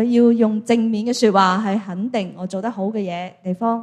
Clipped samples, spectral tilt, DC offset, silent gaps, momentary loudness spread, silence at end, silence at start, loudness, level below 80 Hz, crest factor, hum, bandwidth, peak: under 0.1%; -6 dB/octave; under 0.1%; none; 12 LU; 0 s; 0 s; -19 LUFS; -68 dBFS; 16 dB; none; 11.5 kHz; -2 dBFS